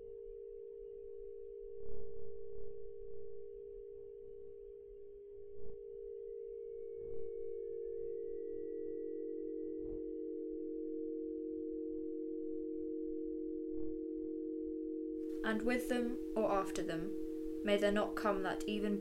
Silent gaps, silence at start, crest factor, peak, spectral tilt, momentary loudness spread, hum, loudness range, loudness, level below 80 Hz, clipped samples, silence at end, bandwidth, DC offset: none; 0 s; 20 dB; -20 dBFS; -5.5 dB/octave; 15 LU; none; 14 LU; -42 LUFS; -60 dBFS; under 0.1%; 0 s; 16 kHz; under 0.1%